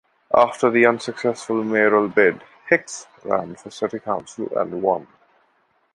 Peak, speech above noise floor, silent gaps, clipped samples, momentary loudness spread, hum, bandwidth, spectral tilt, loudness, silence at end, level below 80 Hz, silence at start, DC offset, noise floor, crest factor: 0 dBFS; 44 dB; none; under 0.1%; 11 LU; none; 11.5 kHz; -5 dB/octave; -20 LUFS; 0.9 s; -62 dBFS; 0.3 s; under 0.1%; -64 dBFS; 20 dB